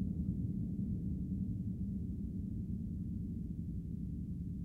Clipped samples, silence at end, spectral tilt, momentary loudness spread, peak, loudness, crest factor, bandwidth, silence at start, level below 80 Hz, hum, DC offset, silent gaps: under 0.1%; 0 s; -12 dB/octave; 4 LU; -24 dBFS; -41 LUFS; 14 dB; 1.2 kHz; 0 s; -48 dBFS; none; under 0.1%; none